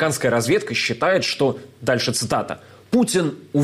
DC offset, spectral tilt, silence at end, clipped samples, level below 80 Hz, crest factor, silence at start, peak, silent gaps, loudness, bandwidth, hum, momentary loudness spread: under 0.1%; -4 dB/octave; 0 s; under 0.1%; -56 dBFS; 12 dB; 0 s; -8 dBFS; none; -20 LUFS; 15.5 kHz; none; 6 LU